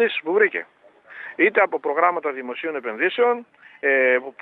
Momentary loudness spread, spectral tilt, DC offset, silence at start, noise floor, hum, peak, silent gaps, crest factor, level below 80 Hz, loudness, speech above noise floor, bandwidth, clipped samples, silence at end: 11 LU; -6.5 dB/octave; under 0.1%; 0 s; -41 dBFS; none; -2 dBFS; none; 18 dB; -84 dBFS; -21 LUFS; 21 dB; 4.2 kHz; under 0.1%; 0.1 s